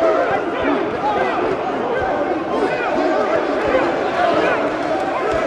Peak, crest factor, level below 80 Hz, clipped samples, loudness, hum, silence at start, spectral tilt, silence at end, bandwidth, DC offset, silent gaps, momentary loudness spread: -4 dBFS; 14 dB; -46 dBFS; under 0.1%; -18 LUFS; none; 0 s; -5.5 dB/octave; 0 s; 11 kHz; under 0.1%; none; 4 LU